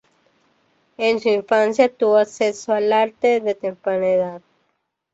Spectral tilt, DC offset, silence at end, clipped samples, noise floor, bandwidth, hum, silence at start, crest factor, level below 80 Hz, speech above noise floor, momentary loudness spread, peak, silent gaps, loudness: -4.5 dB/octave; under 0.1%; 0.75 s; under 0.1%; -71 dBFS; 8 kHz; none; 1 s; 18 dB; -66 dBFS; 53 dB; 6 LU; -2 dBFS; none; -19 LUFS